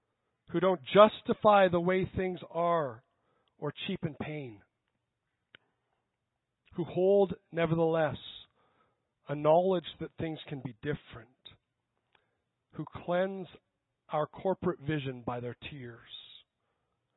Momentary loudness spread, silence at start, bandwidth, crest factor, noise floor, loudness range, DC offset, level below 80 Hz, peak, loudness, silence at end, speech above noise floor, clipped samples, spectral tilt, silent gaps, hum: 20 LU; 0.5 s; 4.1 kHz; 26 dB; -85 dBFS; 15 LU; under 0.1%; -64 dBFS; -6 dBFS; -30 LUFS; 0.95 s; 55 dB; under 0.1%; -10 dB/octave; none; none